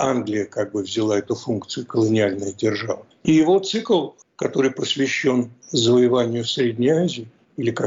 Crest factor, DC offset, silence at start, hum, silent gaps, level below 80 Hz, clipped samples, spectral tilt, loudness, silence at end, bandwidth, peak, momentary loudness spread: 12 dB; under 0.1%; 0 s; none; none; -62 dBFS; under 0.1%; -5 dB/octave; -21 LUFS; 0 s; 7.6 kHz; -8 dBFS; 10 LU